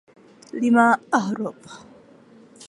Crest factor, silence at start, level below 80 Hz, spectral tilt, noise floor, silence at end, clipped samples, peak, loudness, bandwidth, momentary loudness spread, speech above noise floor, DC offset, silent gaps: 20 dB; 0.55 s; -72 dBFS; -5.5 dB/octave; -50 dBFS; 0.05 s; under 0.1%; -4 dBFS; -20 LUFS; 11.5 kHz; 23 LU; 29 dB; under 0.1%; none